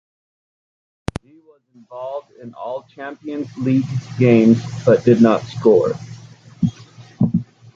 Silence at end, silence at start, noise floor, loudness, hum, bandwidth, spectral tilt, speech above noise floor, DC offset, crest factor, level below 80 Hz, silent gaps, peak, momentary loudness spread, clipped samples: 0.35 s; 1.9 s; -42 dBFS; -17 LUFS; none; 7.6 kHz; -8.5 dB/octave; 25 dB; under 0.1%; 16 dB; -48 dBFS; none; -2 dBFS; 19 LU; under 0.1%